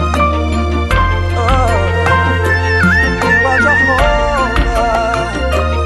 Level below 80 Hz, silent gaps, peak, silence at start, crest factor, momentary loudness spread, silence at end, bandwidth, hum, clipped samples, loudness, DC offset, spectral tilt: -20 dBFS; none; 0 dBFS; 0 s; 12 dB; 6 LU; 0 s; 12.5 kHz; none; under 0.1%; -12 LUFS; under 0.1%; -6 dB/octave